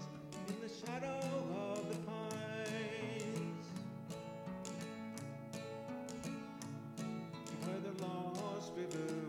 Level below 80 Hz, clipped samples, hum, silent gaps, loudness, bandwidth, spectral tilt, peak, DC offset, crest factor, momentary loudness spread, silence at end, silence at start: -78 dBFS; under 0.1%; none; none; -45 LUFS; 16.5 kHz; -5.5 dB/octave; -28 dBFS; under 0.1%; 16 dB; 6 LU; 0 s; 0 s